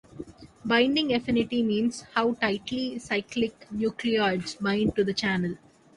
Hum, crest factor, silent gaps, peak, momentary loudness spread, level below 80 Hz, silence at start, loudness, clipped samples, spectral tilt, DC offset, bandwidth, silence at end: none; 18 dB; none; -8 dBFS; 9 LU; -56 dBFS; 0.15 s; -27 LUFS; under 0.1%; -5 dB/octave; under 0.1%; 11 kHz; 0.4 s